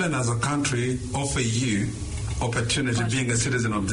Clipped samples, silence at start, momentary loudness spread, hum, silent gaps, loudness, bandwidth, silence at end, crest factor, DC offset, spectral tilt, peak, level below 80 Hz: under 0.1%; 0 s; 5 LU; none; none; -25 LUFS; 11 kHz; 0 s; 12 dB; under 0.1%; -4.5 dB/octave; -12 dBFS; -40 dBFS